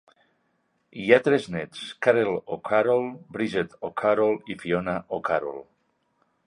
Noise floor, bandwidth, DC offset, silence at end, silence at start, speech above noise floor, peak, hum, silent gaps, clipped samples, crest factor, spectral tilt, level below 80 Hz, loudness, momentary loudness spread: -71 dBFS; 10.5 kHz; under 0.1%; 0.85 s; 0.95 s; 47 dB; -2 dBFS; none; none; under 0.1%; 24 dB; -6 dB/octave; -62 dBFS; -25 LUFS; 13 LU